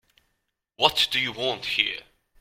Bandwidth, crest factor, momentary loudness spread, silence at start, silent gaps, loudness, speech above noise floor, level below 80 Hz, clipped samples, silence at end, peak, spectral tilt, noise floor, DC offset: 16.5 kHz; 26 dB; 7 LU; 0.8 s; none; -23 LUFS; 52 dB; -60 dBFS; under 0.1%; 0.4 s; -2 dBFS; -2 dB/octave; -77 dBFS; under 0.1%